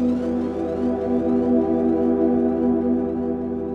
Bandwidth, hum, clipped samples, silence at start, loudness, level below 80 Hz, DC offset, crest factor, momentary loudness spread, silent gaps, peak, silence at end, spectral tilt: 4.7 kHz; none; under 0.1%; 0 s; -21 LUFS; -44 dBFS; under 0.1%; 12 dB; 5 LU; none; -8 dBFS; 0 s; -9.5 dB/octave